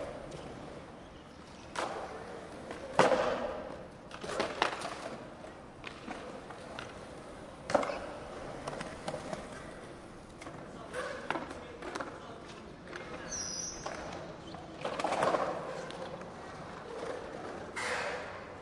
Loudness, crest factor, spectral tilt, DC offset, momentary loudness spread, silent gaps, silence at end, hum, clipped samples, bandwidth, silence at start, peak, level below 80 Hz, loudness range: -38 LUFS; 30 dB; -3.5 dB/octave; under 0.1%; 15 LU; none; 0 s; none; under 0.1%; 11.5 kHz; 0 s; -8 dBFS; -60 dBFS; 8 LU